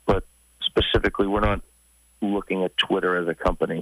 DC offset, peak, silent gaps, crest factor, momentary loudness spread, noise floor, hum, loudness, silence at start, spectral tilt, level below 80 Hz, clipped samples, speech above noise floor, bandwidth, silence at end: under 0.1%; -8 dBFS; none; 16 dB; 6 LU; -44 dBFS; none; -24 LUFS; 0.05 s; -6 dB/octave; -36 dBFS; under 0.1%; 21 dB; 15 kHz; 0 s